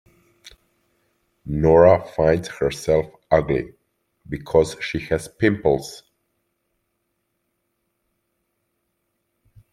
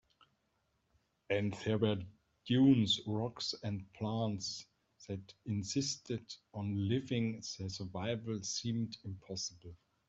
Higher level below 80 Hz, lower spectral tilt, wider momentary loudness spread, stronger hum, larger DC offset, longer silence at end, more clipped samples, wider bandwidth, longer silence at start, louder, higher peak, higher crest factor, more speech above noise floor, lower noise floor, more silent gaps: first, -46 dBFS vs -70 dBFS; first, -6.5 dB/octave vs -5 dB/octave; first, 18 LU vs 15 LU; neither; neither; first, 3.75 s vs 0.35 s; neither; first, 14 kHz vs 8 kHz; second, 0.45 s vs 1.3 s; first, -20 LUFS vs -37 LUFS; first, -2 dBFS vs -16 dBFS; about the same, 20 dB vs 20 dB; first, 55 dB vs 43 dB; second, -74 dBFS vs -80 dBFS; neither